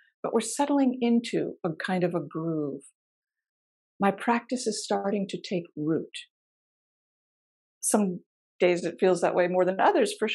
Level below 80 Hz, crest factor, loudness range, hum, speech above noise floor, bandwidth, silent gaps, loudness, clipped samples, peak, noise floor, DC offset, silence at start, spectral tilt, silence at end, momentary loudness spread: -82 dBFS; 20 dB; 6 LU; none; over 64 dB; 12.5 kHz; 2.95-3.22 s, 3.49-4.00 s, 6.30-7.81 s, 8.26-8.59 s; -27 LUFS; under 0.1%; -8 dBFS; under -90 dBFS; under 0.1%; 0.25 s; -4.5 dB/octave; 0 s; 9 LU